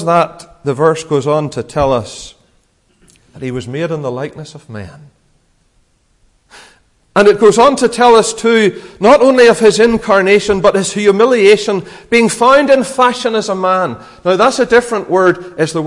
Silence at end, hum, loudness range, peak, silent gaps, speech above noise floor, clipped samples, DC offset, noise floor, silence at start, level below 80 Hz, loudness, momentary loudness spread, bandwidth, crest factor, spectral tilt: 0 s; none; 15 LU; 0 dBFS; none; 44 dB; under 0.1%; under 0.1%; -55 dBFS; 0 s; -44 dBFS; -11 LUFS; 14 LU; 11.5 kHz; 12 dB; -4.5 dB/octave